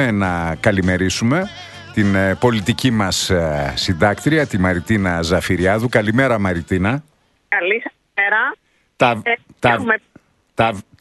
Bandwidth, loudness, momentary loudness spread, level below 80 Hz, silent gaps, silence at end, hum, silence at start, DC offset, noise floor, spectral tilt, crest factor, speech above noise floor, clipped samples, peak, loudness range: 12.5 kHz; -17 LUFS; 5 LU; -40 dBFS; none; 0.2 s; none; 0 s; under 0.1%; -51 dBFS; -5 dB/octave; 18 dB; 34 dB; under 0.1%; 0 dBFS; 2 LU